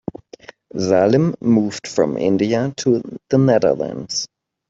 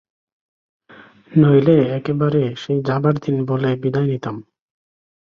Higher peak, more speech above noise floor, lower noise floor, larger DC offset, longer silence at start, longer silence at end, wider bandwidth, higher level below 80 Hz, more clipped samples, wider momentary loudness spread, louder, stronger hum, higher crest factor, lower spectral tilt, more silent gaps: about the same, -2 dBFS vs -2 dBFS; second, 25 dB vs 29 dB; second, -42 dBFS vs -46 dBFS; neither; second, 0.75 s vs 1.3 s; second, 0.45 s vs 0.8 s; first, 8 kHz vs 6.8 kHz; about the same, -56 dBFS vs -56 dBFS; neither; about the same, 10 LU vs 9 LU; about the same, -18 LUFS vs -18 LUFS; neither; about the same, 16 dB vs 18 dB; second, -6 dB/octave vs -9.5 dB/octave; neither